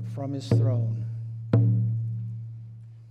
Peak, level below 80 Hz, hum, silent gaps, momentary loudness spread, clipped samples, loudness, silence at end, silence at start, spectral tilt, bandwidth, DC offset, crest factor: -8 dBFS; -58 dBFS; none; none; 18 LU; under 0.1%; -27 LUFS; 0 s; 0 s; -9 dB/octave; 8 kHz; under 0.1%; 18 dB